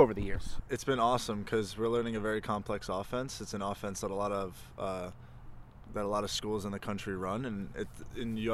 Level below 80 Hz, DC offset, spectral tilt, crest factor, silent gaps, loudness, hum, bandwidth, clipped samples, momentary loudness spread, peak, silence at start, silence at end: -50 dBFS; under 0.1%; -5 dB/octave; 24 dB; none; -35 LUFS; none; 14.5 kHz; under 0.1%; 12 LU; -10 dBFS; 0 s; 0 s